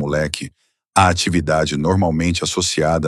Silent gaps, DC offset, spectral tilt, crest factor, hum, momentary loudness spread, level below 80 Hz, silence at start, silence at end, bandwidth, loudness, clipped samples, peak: none; under 0.1%; -4.5 dB/octave; 18 dB; none; 7 LU; -40 dBFS; 0 s; 0 s; 13 kHz; -18 LUFS; under 0.1%; 0 dBFS